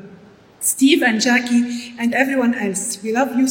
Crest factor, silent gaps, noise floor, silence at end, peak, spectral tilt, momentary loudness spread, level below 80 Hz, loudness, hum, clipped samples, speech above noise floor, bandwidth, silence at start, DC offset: 18 dB; none; -45 dBFS; 0 s; 0 dBFS; -2.5 dB/octave; 8 LU; -66 dBFS; -17 LUFS; none; under 0.1%; 28 dB; 16.5 kHz; 0 s; under 0.1%